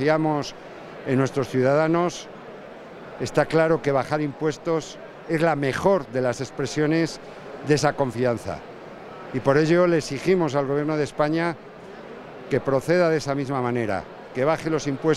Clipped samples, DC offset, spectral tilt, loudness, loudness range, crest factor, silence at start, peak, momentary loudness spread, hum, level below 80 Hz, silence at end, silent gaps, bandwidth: under 0.1%; under 0.1%; -6 dB/octave; -23 LUFS; 2 LU; 20 dB; 0 s; -4 dBFS; 19 LU; none; -54 dBFS; 0 s; none; 13.5 kHz